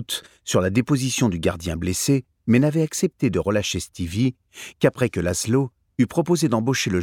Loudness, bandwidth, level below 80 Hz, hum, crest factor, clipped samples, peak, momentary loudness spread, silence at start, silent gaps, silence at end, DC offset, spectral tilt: -22 LUFS; 18.5 kHz; -46 dBFS; none; 18 dB; under 0.1%; -4 dBFS; 7 LU; 0 s; none; 0 s; under 0.1%; -5 dB/octave